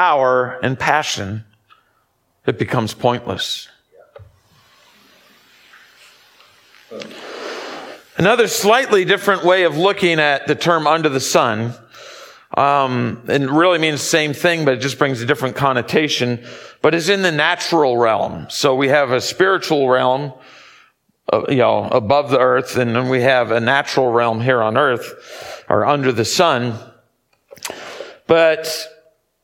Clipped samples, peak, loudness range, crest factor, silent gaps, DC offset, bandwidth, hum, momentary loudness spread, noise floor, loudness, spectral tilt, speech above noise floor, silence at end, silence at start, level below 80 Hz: under 0.1%; 0 dBFS; 8 LU; 18 dB; none; under 0.1%; 17.5 kHz; none; 16 LU; -63 dBFS; -16 LUFS; -4.5 dB/octave; 48 dB; 0.55 s; 0 s; -58 dBFS